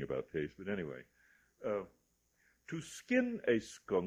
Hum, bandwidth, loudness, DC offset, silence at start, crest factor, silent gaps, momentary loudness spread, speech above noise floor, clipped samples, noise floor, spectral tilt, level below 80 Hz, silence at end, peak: none; 14 kHz; -38 LUFS; under 0.1%; 0 s; 20 dB; none; 12 LU; 38 dB; under 0.1%; -75 dBFS; -5.5 dB/octave; -70 dBFS; 0 s; -18 dBFS